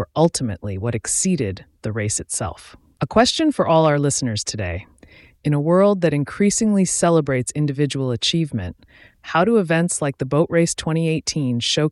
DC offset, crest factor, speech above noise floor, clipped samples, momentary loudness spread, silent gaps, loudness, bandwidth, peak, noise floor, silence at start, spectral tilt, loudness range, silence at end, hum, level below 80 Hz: under 0.1%; 16 dB; 29 dB; under 0.1%; 11 LU; none; -20 LUFS; 12 kHz; -4 dBFS; -49 dBFS; 0 s; -4.5 dB/octave; 2 LU; 0 s; none; -48 dBFS